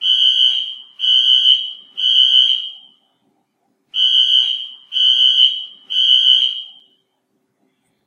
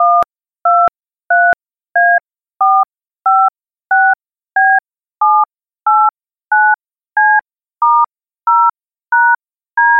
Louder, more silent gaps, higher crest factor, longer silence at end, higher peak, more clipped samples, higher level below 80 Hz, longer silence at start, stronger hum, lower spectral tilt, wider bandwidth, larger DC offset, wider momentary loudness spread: about the same, -11 LUFS vs -13 LUFS; neither; first, 16 dB vs 10 dB; first, 1.35 s vs 0 s; about the same, 0 dBFS vs -2 dBFS; neither; second, -86 dBFS vs -62 dBFS; about the same, 0 s vs 0 s; neither; second, 4 dB/octave vs -4.5 dB/octave; first, 10 kHz vs 4.1 kHz; neither; first, 14 LU vs 8 LU